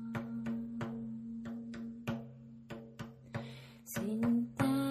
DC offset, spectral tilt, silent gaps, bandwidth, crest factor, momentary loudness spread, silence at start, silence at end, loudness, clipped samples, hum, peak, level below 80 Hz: under 0.1%; -6.5 dB/octave; none; 14.5 kHz; 20 dB; 17 LU; 0 s; 0 s; -39 LUFS; under 0.1%; none; -20 dBFS; -68 dBFS